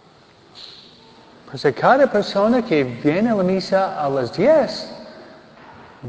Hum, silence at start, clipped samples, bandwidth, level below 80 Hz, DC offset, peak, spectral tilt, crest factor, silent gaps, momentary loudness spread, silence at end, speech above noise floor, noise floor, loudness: none; 0.55 s; under 0.1%; 8 kHz; -58 dBFS; under 0.1%; -2 dBFS; -6.5 dB/octave; 18 dB; none; 22 LU; 0 s; 32 dB; -50 dBFS; -18 LUFS